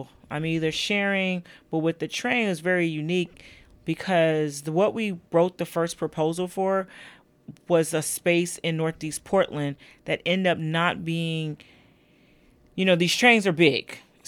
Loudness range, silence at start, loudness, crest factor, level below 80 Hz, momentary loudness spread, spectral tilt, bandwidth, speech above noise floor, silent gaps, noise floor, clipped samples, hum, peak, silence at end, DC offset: 3 LU; 0 s; -24 LUFS; 22 dB; -62 dBFS; 12 LU; -4.5 dB/octave; 20 kHz; 34 dB; none; -59 dBFS; under 0.1%; none; -4 dBFS; 0.3 s; under 0.1%